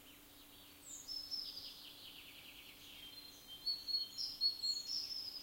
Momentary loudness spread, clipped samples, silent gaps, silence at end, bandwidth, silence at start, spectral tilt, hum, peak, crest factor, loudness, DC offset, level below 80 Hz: 20 LU; under 0.1%; none; 0 s; 16.5 kHz; 0 s; 0.5 dB/octave; none; -26 dBFS; 20 dB; -41 LUFS; under 0.1%; -74 dBFS